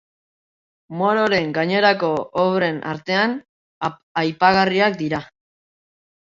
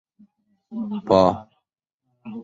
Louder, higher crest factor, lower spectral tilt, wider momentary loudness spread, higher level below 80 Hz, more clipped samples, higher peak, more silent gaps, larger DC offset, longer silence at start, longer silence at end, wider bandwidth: about the same, -19 LUFS vs -20 LUFS; about the same, 20 dB vs 22 dB; second, -6 dB/octave vs -7.5 dB/octave; second, 11 LU vs 19 LU; second, -58 dBFS vs -52 dBFS; neither; about the same, -2 dBFS vs -2 dBFS; first, 3.49-3.81 s, 4.03-4.15 s vs 1.94-1.98 s; neither; first, 0.9 s vs 0.7 s; first, 1.05 s vs 0 s; about the same, 7.6 kHz vs 7.8 kHz